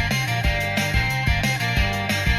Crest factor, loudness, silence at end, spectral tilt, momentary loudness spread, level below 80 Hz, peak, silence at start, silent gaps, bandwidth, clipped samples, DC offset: 14 dB; -21 LUFS; 0 s; -4.5 dB/octave; 1 LU; -28 dBFS; -6 dBFS; 0 s; none; 16 kHz; under 0.1%; under 0.1%